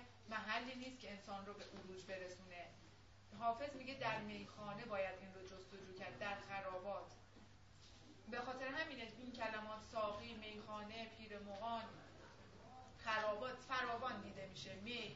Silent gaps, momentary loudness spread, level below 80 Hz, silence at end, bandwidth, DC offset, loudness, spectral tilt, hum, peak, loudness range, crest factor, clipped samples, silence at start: none; 18 LU; -72 dBFS; 0 s; 7.6 kHz; under 0.1%; -48 LUFS; -2 dB/octave; none; -28 dBFS; 4 LU; 20 dB; under 0.1%; 0 s